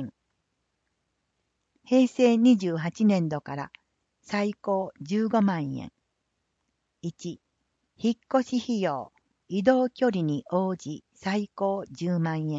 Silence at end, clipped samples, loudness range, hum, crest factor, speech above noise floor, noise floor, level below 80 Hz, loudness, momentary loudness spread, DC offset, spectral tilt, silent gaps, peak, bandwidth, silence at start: 0 s; under 0.1%; 6 LU; none; 20 dB; 53 dB; -78 dBFS; -70 dBFS; -26 LUFS; 17 LU; under 0.1%; -7 dB/octave; none; -8 dBFS; 7.8 kHz; 0 s